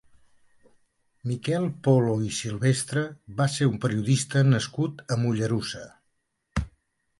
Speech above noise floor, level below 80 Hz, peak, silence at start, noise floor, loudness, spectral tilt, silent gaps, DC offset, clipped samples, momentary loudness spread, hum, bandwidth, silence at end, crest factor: 50 dB; -48 dBFS; -8 dBFS; 1.25 s; -75 dBFS; -26 LUFS; -6 dB/octave; none; under 0.1%; under 0.1%; 12 LU; none; 11.5 kHz; 0.5 s; 20 dB